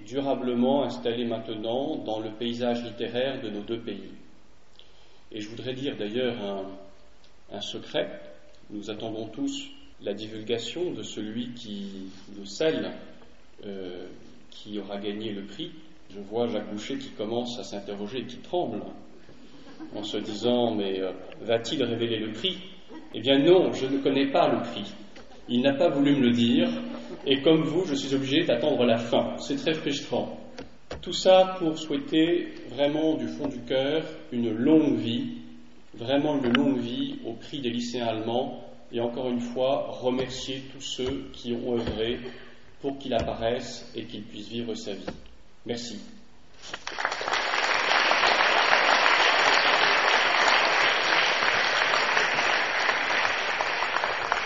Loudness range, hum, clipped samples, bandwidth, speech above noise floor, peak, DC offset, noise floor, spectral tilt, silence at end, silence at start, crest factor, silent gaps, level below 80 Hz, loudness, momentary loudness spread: 14 LU; none; under 0.1%; 8 kHz; 30 dB; -2 dBFS; 0.6%; -58 dBFS; -2 dB/octave; 0 s; 0 s; 24 dB; none; -58 dBFS; -26 LUFS; 18 LU